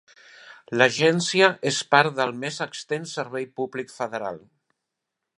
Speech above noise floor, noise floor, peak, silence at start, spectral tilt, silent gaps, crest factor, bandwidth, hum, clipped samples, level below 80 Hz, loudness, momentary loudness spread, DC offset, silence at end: 60 dB; -83 dBFS; 0 dBFS; 0.45 s; -3.5 dB/octave; none; 24 dB; 11.5 kHz; none; under 0.1%; -74 dBFS; -23 LUFS; 12 LU; under 0.1%; 1 s